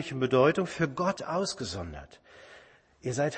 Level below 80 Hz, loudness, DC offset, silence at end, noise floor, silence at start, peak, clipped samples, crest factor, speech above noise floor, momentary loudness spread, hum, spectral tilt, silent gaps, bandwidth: -56 dBFS; -29 LUFS; under 0.1%; 0 s; -57 dBFS; 0 s; -10 dBFS; under 0.1%; 20 dB; 27 dB; 16 LU; none; -5.5 dB/octave; none; 8.8 kHz